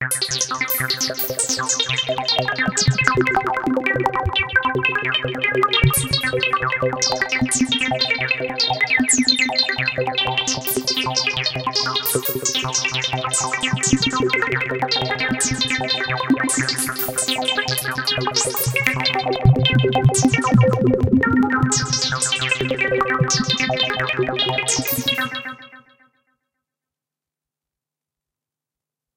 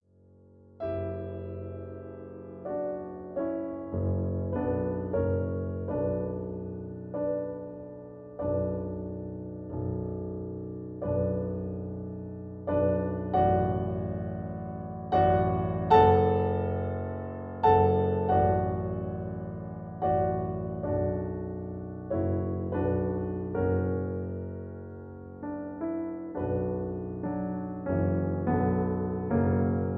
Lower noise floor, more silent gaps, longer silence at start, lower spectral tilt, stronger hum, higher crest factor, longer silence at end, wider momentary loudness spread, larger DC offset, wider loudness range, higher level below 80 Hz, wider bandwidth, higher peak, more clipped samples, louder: first, -88 dBFS vs -58 dBFS; neither; second, 0 s vs 0.75 s; second, -3 dB/octave vs -11 dB/octave; neither; about the same, 20 dB vs 22 dB; first, 3.35 s vs 0 s; second, 5 LU vs 14 LU; neither; second, 3 LU vs 9 LU; first, -42 dBFS vs -50 dBFS; first, 17 kHz vs 4.8 kHz; first, 0 dBFS vs -8 dBFS; neither; first, -18 LUFS vs -30 LUFS